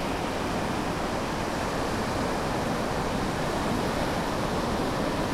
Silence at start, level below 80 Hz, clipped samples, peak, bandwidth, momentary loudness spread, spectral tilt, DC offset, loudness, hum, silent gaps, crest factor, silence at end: 0 s; -40 dBFS; under 0.1%; -14 dBFS; 16 kHz; 2 LU; -5 dB/octave; under 0.1%; -28 LUFS; none; none; 14 dB; 0 s